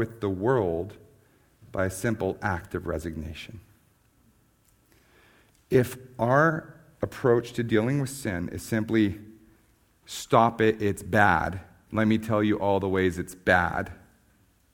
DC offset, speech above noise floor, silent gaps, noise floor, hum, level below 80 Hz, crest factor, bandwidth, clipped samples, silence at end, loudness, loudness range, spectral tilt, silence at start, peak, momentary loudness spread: under 0.1%; 38 dB; none; -64 dBFS; none; -52 dBFS; 24 dB; 19.5 kHz; under 0.1%; 0.8 s; -26 LUFS; 9 LU; -6 dB/octave; 0 s; -4 dBFS; 14 LU